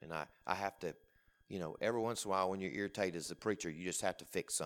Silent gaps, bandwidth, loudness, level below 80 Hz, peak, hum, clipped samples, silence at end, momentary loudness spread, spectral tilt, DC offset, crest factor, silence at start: none; 19 kHz; -40 LUFS; -72 dBFS; -16 dBFS; none; under 0.1%; 0 s; 9 LU; -3.5 dB/octave; under 0.1%; 24 dB; 0 s